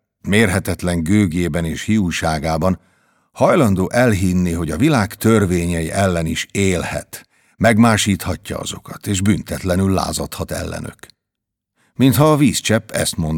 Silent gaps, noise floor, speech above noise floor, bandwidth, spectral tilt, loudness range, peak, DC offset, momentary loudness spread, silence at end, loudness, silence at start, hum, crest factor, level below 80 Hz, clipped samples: none; -80 dBFS; 64 dB; 19 kHz; -5.5 dB/octave; 4 LU; 0 dBFS; under 0.1%; 12 LU; 0 s; -17 LUFS; 0.25 s; none; 18 dB; -38 dBFS; under 0.1%